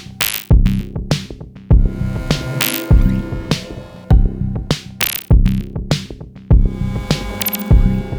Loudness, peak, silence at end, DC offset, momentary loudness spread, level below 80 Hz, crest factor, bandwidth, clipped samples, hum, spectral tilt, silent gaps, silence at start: -17 LUFS; 0 dBFS; 0 s; under 0.1%; 8 LU; -18 dBFS; 14 dB; over 20 kHz; under 0.1%; none; -5.5 dB/octave; none; 0 s